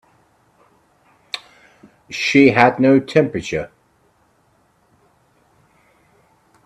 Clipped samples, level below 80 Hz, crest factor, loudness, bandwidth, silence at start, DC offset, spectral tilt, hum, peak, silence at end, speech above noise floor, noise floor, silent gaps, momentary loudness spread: under 0.1%; -56 dBFS; 20 dB; -15 LUFS; 10 kHz; 1.35 s; under 0.1%; -6 dB/octave; none; 0 dBFS; 3 s; 45 dB; -59 dBFS; none; 19 LU